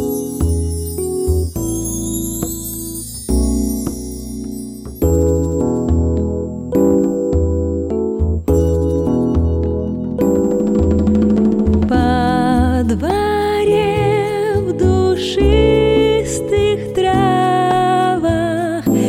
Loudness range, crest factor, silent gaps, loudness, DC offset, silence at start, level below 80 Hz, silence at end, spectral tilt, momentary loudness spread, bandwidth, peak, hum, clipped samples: 6 LU; 14 dB; none; -16 LUFS; under 0.1%; 0 s; -24 dBFS; 0 s; -6.5 dB/octave; 8 LU; 16 kHz; -2 dBFS; none; under 0.1%